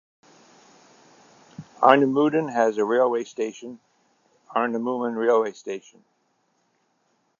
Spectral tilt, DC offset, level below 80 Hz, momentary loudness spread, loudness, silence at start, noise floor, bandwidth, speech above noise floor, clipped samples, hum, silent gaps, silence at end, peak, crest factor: -5.5 dB/octave; under 0.1%; -76 dBFS; 19 LU; -22 LUFS; 1.6 s; -69 dBFS; 7.4 kHz; 47 dB; under 0.1%; none; none; 1.6 s; 0 dBFS; 24 dB